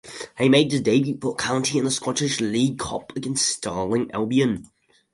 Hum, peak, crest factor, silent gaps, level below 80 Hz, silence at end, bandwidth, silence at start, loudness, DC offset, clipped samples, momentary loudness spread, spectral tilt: none; -4 dBFS; 18 dB; none; -54 dBFS; 0.5 s; 11.5 kHz; 0.05 s; -22 LUFS; under 0.1%; under 0.1%; 10 LU; -4 dB/octave